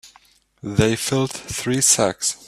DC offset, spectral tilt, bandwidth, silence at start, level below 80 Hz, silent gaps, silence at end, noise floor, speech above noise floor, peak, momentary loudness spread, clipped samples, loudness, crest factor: under 0.1%; -3.5 dB/octave; 16 kHz; 0.05 s; -48 dBFS; none; 0 s; -55 dBFS; 35 dB; -2 dBFS; 10 LU; under 0.1%; -19 LUFS; 20 dB